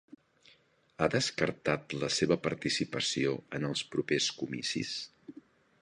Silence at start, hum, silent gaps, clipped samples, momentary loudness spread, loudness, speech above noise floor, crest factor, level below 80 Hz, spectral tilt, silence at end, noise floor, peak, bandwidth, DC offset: 1 s; none; none; under 0.1%; 7 LU; -32 LUFS; 34 dB; 24 dB; -64 dBFS; -4 dB/octave; 0.5 s; -66 dBFS; -10 dBFS; 11 kHz; under 0.1%